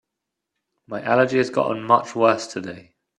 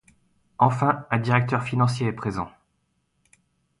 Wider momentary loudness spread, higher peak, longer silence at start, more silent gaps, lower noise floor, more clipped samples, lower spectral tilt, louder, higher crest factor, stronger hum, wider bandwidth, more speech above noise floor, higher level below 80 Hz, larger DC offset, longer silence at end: first, 14 LU vs 9 LU; about the same, -2 dBFS vs -4 dBFS; first, 0.9 s vs 0.6 s; neither; first, -82 dBFS vs -72 dBFS; neither; second, -5.5 dB/octave vs -7 dB/octave; first, -20 LUFS vs -23 LUFS; about the same, 22 dB vs 22 dB; neither; about the same, 11 kHz vs 11 kHz; first, 62 dB vs 49 dB; second, -66 dBFS vs -56 dBFS; neither; second, 0.35 s vs 1.3 s